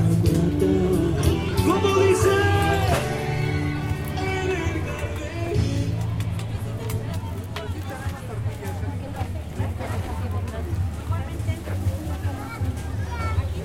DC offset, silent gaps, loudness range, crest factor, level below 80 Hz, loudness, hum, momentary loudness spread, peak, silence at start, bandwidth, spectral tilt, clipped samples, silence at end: under 0.1%; none; 9 LU; 16 dB; -34 dBFS; -25 LUFS; none; 11 LU; -6 dBFS; 0 s; 16 kHz; -6.5 dB/octave; under 0.1%; 0 s